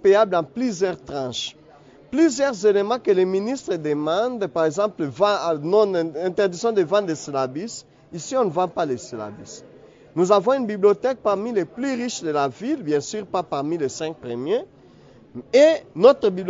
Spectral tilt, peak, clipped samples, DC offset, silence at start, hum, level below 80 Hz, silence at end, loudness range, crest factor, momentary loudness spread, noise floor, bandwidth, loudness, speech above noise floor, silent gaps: -5 dB/octave; -2 dBFS; under 0.1%; under 0.1%; 0.05 s; none; -64 dBFS; 0 s; 4 LU; 20 dB; 13 LU; -49 dBFS; 7.8 kHz; -22 LUFS; 28 dB; none